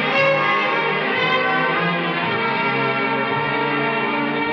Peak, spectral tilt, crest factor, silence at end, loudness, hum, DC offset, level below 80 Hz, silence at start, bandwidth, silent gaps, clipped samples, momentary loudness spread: -6 dBFS; -6.5 dB/octave; 14 dB; 0 s; -19 LUFS; none; under 0.1%; -66 dBFS; 0 s; 7 kHz; none; under 0.1%; 4 LU